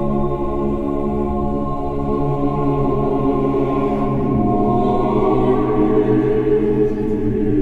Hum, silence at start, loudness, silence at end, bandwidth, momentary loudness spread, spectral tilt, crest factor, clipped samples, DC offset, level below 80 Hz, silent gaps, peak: none; 0 s; -18 LUFS; 0 s; 4.6 kHz; 5 LU; -10.5 dB/octave; 12 dB; under 0.1%; 0.3%; -28 dBFS; none; -4 dBFS